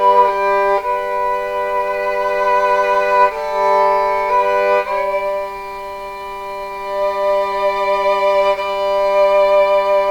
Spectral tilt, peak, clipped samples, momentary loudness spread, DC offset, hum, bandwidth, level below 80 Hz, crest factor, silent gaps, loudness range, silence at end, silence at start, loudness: -3.5 dB/octave; 0 dBFS; under 0.1%; 13 LU; 0.3%; none; 17.5 kHz; -46 dBFS; 16 dB; none; 4 LU; 0 s; 0 s; -16 LUFS